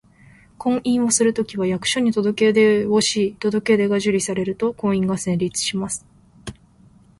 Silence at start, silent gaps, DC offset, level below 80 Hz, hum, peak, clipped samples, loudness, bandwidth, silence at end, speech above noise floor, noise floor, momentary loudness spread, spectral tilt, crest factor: 0.6 s; none; under 0.1%; -54 dBFS; none; -4 dBFS; under 0.1%; -20 LUFS; 11.5 kHz; 0.65 s; 32 dB; -51 dBFS; 11 LU; -4 dB/octave; 16 dB